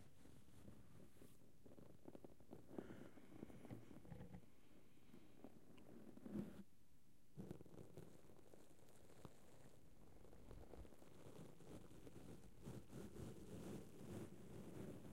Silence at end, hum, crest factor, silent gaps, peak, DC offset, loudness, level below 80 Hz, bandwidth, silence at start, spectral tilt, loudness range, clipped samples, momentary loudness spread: 0 s; none; 24 dB; none; -38 dBFS; under 0.1%; -61 LUFS; -74 dBFS; 16 kHz; 0 s; -6.5 dB/octave; 6 LU; under 0.1%; 12 LU